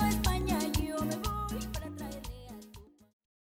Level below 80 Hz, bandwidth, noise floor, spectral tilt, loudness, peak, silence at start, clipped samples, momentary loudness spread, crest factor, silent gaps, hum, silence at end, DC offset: -40 dBFS; 18.5 kHz; -54 dBFS; -5 dB/octave; -34 LUFS; -18 dBFS; 0 s; under 0.1%; 18 LU; 16 dB; none; none; 0.7 s; under 0.1%